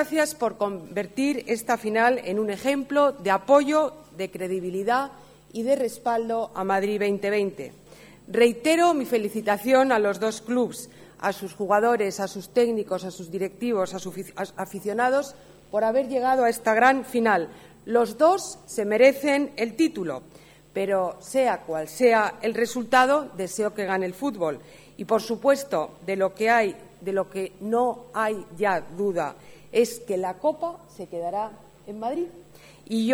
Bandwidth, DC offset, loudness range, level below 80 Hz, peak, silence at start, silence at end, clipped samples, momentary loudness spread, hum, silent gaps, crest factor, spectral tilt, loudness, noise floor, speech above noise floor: 19.5 kHz; under 0.1%; 5 LU; -64 dBFS; -6 dBFS; 0 s; 0 s; under 0.1%; 13 LU; none; none; 20 dB; -4.5 dB/octave; -24 LUFS; -45 dBFS; 21 dB